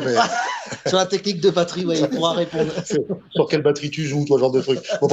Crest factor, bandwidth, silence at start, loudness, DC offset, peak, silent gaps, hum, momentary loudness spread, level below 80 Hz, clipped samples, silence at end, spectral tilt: 16 dB; 8.2 kHz; 0 s; -20 LUFS; under 0.1%; -2 dBFS; none; none; 6 LU; -60 dBFS; under 0.1%; 0 s; -5 dB/octave